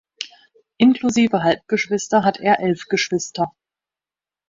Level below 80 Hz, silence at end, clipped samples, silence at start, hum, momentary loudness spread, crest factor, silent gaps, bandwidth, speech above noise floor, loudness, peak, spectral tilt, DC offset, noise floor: -60 dBFS; 1 s; under 0.1%; 0.2 s; none; 10 LU; 18 dB; none; 7.8 kHz; over 72 dB; -19 LUFS; -2 dBFS; -4.5 dB/octave; under 0.1%; under -90 dBFS